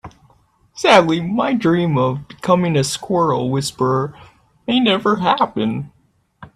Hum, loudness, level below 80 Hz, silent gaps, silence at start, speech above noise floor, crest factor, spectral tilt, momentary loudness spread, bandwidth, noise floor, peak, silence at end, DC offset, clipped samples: none; -17 LUFS; -54 dBFS; none; 0.05 s; 43 dB; 18 dB; -5.5 dB/octave; 10 LU; 13.5 kHz; -60 dBFS; 0 dBFS; 0.1 s; under 0.1%; under 0.1%